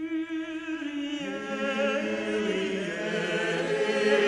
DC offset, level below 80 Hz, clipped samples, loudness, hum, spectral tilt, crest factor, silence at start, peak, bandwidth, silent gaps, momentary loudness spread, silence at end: under 0.1%; -68 dBFS; under 0.1%; -29 LUFS; none; -4.5 dB/octave; 16 dB; 0 s; -12 dBFS; 11 kHz; none; 7 LU; 0 s